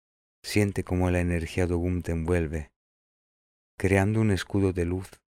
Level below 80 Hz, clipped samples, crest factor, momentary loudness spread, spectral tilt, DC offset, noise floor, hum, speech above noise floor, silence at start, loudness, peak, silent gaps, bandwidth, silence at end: -44 dBFS; under 0.1%; 20 dB; 7 LU; -6.5 dB/octave; under 0.1%; under -90 dBFS; none; over 64 dB; 0.45 s; -27 LUFS; -8 dBFS; 2.76-3.78 s; 15.5 kHz; 0.25 s